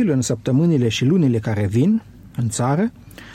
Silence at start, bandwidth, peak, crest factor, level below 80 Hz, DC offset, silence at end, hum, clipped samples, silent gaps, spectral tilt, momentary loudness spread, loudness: 0 s; 13.5 kHz; -6 dBFS; 12 dB; -50 dBFS; under 0.1%; 0 s; none; under 0.1%; none; -6.5 dB/octave; 8 LU; -19 LUFS